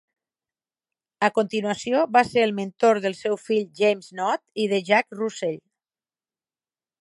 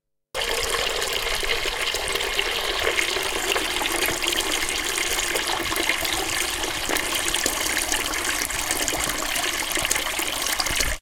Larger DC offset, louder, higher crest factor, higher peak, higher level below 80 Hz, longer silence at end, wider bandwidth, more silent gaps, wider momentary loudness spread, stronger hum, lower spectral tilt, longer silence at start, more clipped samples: neither; about the same, -23 LUFS vs -23 LUFS; about the same, 22 dB vs 22 dB; about the same, -4 dBFS vs -2 dBFS; second, -70 dBFS vs -40 dBFS; first, 1.4 s vs 0 s; second, 11.5 kHz vs 19 kHz; neither; first, 8 LU vs 2 LU; neither; first, -4.5 dB/octave vs -0.5 dB/octave; first, 1.2 s vs 0.35 s; neither